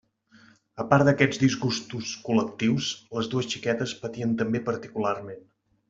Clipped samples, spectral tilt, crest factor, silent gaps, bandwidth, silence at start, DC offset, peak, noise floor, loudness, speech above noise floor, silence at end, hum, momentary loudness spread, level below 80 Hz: under 0.1%; -5.5 dB/octave; 22 dB; none; 7.8 kHz; 0.75 s; under 0.1%; -4 dBFS; -57 dBFS; -26 LUFS; 31 dB; 0.5 s; none; 12 LU; -62 dBFS